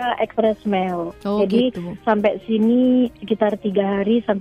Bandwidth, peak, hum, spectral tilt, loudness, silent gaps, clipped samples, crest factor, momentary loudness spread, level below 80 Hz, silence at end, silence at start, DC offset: 5.6 kHz; -4 dBFS; none; -8 dB/octave; -20 LUFS; none; under 0.1%; 16 dB; 7 LU; -52 dBFS; 0 s; 0 s; under 0.1%